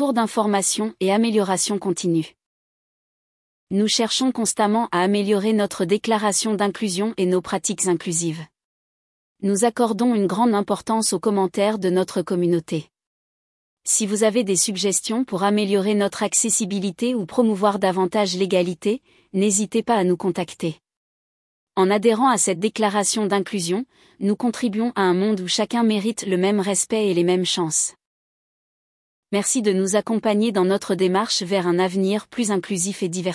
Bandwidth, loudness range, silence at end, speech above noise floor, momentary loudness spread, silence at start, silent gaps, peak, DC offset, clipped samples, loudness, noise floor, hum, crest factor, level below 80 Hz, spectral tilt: 12 kHz; 3 LU; 0 s; over 70 dB; 5 LU; 0 s; 2.46-3.67 s, 8.65-9.35 s, 13.07-13.77 s, 20.97-21.67 s, 28.07-29.23 s; -6 dBFS; under 0.1%; under 0.1%; -21 LUFS; under -90 dBFS; none; 16 dB; -68 dBFS; -4 dB/octave